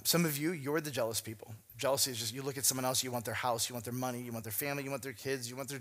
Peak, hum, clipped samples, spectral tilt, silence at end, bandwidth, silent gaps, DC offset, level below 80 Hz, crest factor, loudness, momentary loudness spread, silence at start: -14 dBFS; none; under 0.1%; -3 dB/octave; 0 s; 16 kHz; none; under 0.1%; -74 dBFS; 20 dB; -34 LUFS; 9 LU; 0 s